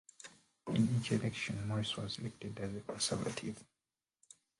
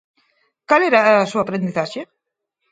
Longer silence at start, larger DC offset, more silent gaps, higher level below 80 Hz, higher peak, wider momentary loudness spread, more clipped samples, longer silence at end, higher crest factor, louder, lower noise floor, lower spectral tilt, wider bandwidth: second, 0.25 s vs 0.7 s; neither; neither; about the same, -66 dBFS vs -66 dBFS; second, -20 dBFS vs 0 dBFS; first, 19 LU vs 13 LU; neither; first, 0.95 s vs 0.65 s; about the same, 20 dB vs 20 dB; second, -38 LUFS vs -17 LUFS; first, under -90 dBFS vs -77 dBFS; about the same, -5 dB/octave vs -5.5 dB/octave; first, 11.5 kHz vs 9.2 kHz